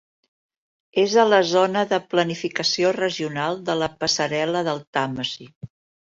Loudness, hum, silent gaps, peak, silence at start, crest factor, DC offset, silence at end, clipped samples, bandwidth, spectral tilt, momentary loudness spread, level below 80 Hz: -21 LUFS; none; 4.87-4.93 s, 5.56-5.61 s; -4 dBFS; 0.95 s; 18 dB; under 0.1%; 0.4 s; under 0.1%; 7.8 kHz; -4 dB/octave; 9 LU; -62 dBFS